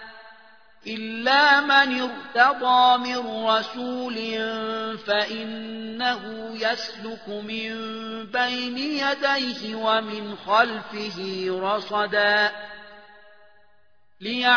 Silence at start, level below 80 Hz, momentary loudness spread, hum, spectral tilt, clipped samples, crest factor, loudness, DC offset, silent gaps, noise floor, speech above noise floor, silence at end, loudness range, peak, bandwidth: 0 s; -72 dBFS; 15 LU; none; -3.5 dB/octave; under 0.1%; 20 dB; -23 LUFS; 0.2%; none; -66 dBFS; 42 dB; 0 s; 8 LU; -4 dBFS; 5.4 kHz